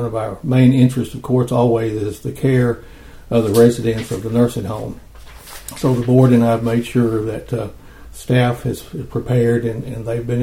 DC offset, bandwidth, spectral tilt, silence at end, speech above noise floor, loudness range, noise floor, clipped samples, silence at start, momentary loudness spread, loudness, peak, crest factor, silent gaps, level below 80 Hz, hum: under 0.1%; 16 kHz; -7.5 dB/octave; 0 s; 20 dB; 3 LU; -36 dBFS; under 0.1%; 0 s; 15 LU; -17 LUFS; 0 dBFS; 16 dB; none; -40 dBFS; none